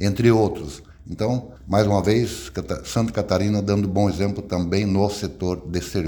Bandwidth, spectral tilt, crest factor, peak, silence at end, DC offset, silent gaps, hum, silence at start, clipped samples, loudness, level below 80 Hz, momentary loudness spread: 19 kHz; -6.5 dB/octave; 18 dB; -4 dBFS; 0 s; under 0.1%; none; none; 0 s; under 0.1%; -22 LUFS; -42 dBFS; 11 LU